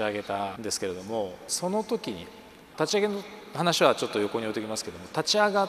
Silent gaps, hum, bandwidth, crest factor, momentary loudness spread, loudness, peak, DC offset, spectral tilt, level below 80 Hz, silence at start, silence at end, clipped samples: none; none; 15.5 kHz; 24 dB; 14 LU; -28 LUFS; -4 dBFS; under 0.1%; -3.5 dB/octave; -66 dBFS; 0 s; 0 s; under 0.1%